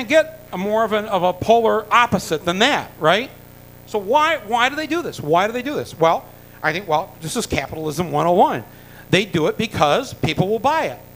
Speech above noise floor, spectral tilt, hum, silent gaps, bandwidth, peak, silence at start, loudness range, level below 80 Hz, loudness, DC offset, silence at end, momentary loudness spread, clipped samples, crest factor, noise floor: 23 dB; -4.5 dB/octave; 60 Hz at -45 dBFS; none; 16 kHz; 0 dBFS; 0 s; 3 LU; -48 dBFS; -19 LUFS; under 0.1%; 0.05 s; 9 LU; under 0.1%; 20 dB; -42 dBFS